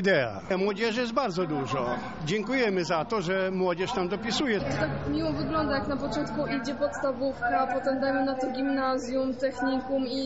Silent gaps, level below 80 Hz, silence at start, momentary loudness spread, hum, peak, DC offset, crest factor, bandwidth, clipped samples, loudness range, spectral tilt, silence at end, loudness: none; -52 dBFS; 0 s; 4 LU; none; -12 dBFS; 0.3%; 16 dB; 8 kHz; under 0.1%; 1 LU; -4 dB/octave; 0 s; -28 LUFS